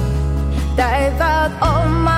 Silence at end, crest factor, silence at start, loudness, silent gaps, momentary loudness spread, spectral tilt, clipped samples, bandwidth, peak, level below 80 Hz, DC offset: 0 s; 12 dB; 0 s; -17 LUFS; none; 4 LU; -6.5 dB/octave; under 0.1%; 14.5 kHz; -4 dBFS; -20 dBFS; under 0.1%